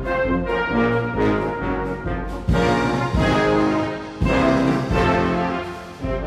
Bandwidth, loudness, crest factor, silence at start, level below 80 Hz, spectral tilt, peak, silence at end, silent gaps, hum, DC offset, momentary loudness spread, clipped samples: 12.5 kHz; -21 LUFS; 14 dB; 0 s; -32 dBFS; -7 dB/octave; -6 dBFS; 0 s; none; none; under 0.1%; 9 LU; under 0.1%